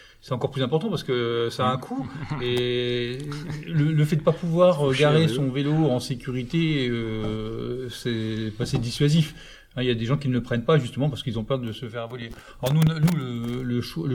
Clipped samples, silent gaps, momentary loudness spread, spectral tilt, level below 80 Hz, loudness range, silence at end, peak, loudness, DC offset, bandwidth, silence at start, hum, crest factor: under 0.1%; none; 12 LU; -6.5 dB/octave; -48 dBFS; 4 LU; 0 s; -6 dBFS; -25 LUFS; under 0.1%; 18.5 kHz; 0 s; none; 18 dB